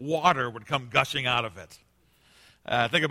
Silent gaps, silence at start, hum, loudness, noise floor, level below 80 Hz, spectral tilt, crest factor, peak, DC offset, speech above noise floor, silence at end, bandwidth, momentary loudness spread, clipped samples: none; 0 s; none; -26 LUFS; -63 dBFS; -60 dBFS; -4 dB/octave; 24 dB; -4 dBFS; under 0.1%; 36 dB; 0 s; 16.5 kHz; 13 LU; under 0.1%